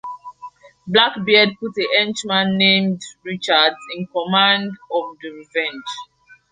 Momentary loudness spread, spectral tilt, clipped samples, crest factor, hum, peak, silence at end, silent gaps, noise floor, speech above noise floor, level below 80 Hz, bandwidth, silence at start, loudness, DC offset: 18 LU; -4 dB/octave; under 0.1%; 20 dB; none; 0 dBFS; 0.15 s; none; -40 dBFS; 22 dB; -64 dBFS; 9.6 kHz; 0.05 s; -17 LUFS; under 0.1%